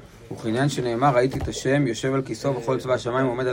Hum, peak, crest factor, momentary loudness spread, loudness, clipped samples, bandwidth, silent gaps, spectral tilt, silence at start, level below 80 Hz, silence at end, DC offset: none; -8 dBFS; 16 dB; 7 LU; -23 LUFS; under 0.1%; 16 kHz; none; -6 dB/octave; 0 s; -48 dBFS; 0 s; under 0.1%